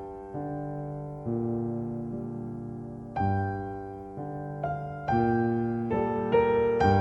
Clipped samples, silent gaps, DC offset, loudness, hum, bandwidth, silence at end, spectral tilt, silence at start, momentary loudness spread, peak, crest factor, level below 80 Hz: under 0.1%; none; under 0.1%; -30 LUFS; none; 7.8 kHz; 0 s; -9 dB/octave; 0 s; 14 LU; -12 dBFS; 18 dB; -50 dBFS